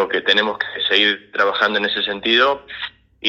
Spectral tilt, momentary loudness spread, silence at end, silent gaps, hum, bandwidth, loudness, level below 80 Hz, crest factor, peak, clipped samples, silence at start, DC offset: -3.5 dB/octave; 11 LU; 0 s; none; none; 7.8 kHz; -17 LUFS; -58 dBFS; 18 dB; 0 dBFS; under 0.1%; 0 s; under 0.1%